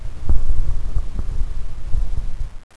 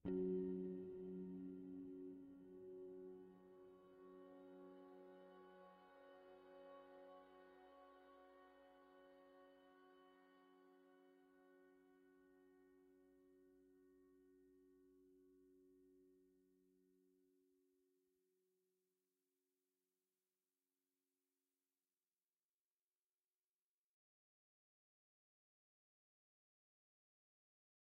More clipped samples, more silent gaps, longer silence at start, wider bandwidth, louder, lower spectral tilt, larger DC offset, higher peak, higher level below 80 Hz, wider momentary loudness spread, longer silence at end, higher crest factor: neither; neither; about the same, 0 s vs 0.05 s; second, 1.8 kHz vs 4.6 kHz; first, -28 LUFS vs -54 LUFS; second, -7 dB/octave vs -8.5 dB/octave; neither; first, 0 dBFS vs -36 dBFS; first, -20 dBFS vs -88 dBFS; second, 8 LU vs 19 LU; second, 0.15 s vs 10.75 s; second, 14 dB vs 24 dB